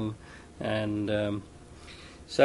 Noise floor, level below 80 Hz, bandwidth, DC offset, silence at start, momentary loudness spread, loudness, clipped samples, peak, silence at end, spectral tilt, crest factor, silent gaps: -48 dBFS; -54 dBFS; 11.5 kHz; under 0.1%; 0 s; 19 LU; -32 LUFS; under 0.1%; -8 dBFS; 0 s; -6 dB/octave; 22 dB; none